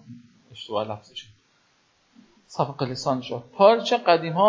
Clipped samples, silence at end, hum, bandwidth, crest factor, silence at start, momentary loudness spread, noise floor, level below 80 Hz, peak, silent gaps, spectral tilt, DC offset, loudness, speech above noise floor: under 0.1%; 0 s; none; 7.6 kHz; 22 dB; 0.1 s; 20 LU; -64 dBFS; -68 dBFS; -4 dBFS; none; -5.5 dB/octave; under 0.1%; -23 LUFS; 42 dB